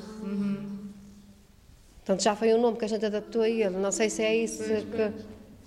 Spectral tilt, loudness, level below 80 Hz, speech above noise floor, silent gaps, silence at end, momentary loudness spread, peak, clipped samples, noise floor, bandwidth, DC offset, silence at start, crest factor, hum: -4.5 dB/octave; -28 LUFS; -58 dBFS; 28 dB; none; 0.1 s; 17 LU; -12 dBFS; under 0.1%; -55 dBFS; 12.5 kHz; under 0.1%; 0 s; 16 dB; none